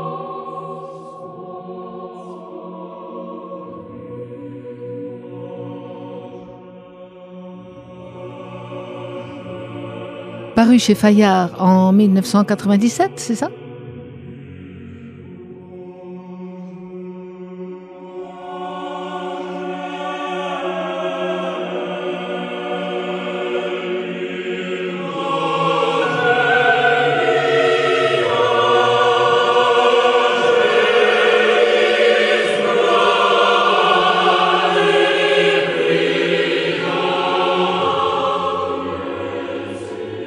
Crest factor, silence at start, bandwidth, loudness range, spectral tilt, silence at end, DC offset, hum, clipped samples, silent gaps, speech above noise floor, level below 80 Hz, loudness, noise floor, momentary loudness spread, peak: 16 dB; 0 s; 14 kHz; 20 LU; -5 dB/octave; 0 s; under 0.1%; none; under 0.1%; none; 25 dB; -60 dBFS; -16 LUFS; -39 dBFS; 21 LU; -2 dBFS